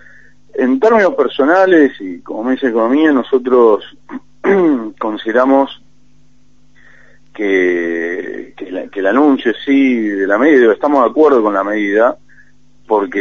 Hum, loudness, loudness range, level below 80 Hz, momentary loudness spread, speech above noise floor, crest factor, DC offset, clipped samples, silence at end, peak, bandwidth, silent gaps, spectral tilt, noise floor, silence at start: none; -13 LUFS; 5 LU; -58 dBFS; 14 LU; 41 dB; 14 dB; 0.8%; under 0.1%; 0 s; 0 dBFS; 7 kHz; none; -6.5 dB/octave; -53 dBFS; 0.55 s